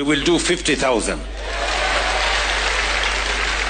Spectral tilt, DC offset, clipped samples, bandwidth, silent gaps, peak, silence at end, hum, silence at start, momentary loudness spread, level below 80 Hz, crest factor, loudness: -2.5 dB/octave; under 0.1%; under 0.1%; 9.6 kHz; none; -6 dBFS; 0 s; none; 0 s; 6 LU; -30 dBFS; 12 dB; -19 LUFS